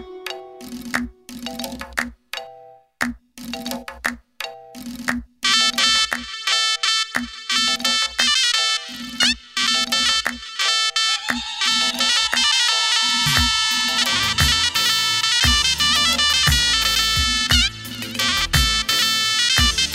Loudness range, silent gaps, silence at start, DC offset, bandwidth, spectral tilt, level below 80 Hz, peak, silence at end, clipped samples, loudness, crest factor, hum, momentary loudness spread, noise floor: 13 LU; none; 0 s; under 0.1%; 16.5 kHz; -1 dB/octave; -34 dBFS; 0 dBFS; 0 s; under 0.1%; -17 LUFS; 20 dB; none; 17 LU; -45 dBFS